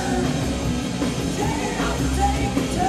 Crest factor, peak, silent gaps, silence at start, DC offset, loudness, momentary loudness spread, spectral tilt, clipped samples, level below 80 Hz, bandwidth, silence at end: 14 dB; -8 dBFS; none; 0 s; under 0.1%; -23 LUFS; 3 LU; -5 dB/octave; under 0.1%; -30 dBFS; 15 kHz; 0 s